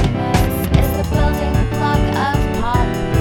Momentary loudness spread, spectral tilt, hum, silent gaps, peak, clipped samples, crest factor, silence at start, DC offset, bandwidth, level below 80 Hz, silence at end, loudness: 2 LU; -6.5 dB/octave; none; none; 0 dBFS; under 0.1%; 16 dB; 0 s; 0.2%; 19 kHz; -22 dBFS; 0 s; -17 LUFS